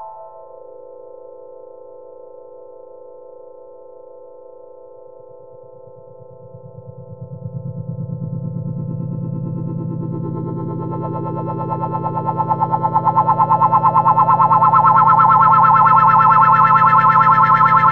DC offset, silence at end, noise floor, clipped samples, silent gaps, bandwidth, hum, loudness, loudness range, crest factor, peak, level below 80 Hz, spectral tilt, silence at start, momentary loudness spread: 0.5%; 0 s; -40 dBFS; under 0.1%; none; 5.6 kHz; none; -14 LUFS; 20 LU; 16 dB; 0 dBFS; -54 dBFS; -9.5 dB/octave; 0 s; 17 LU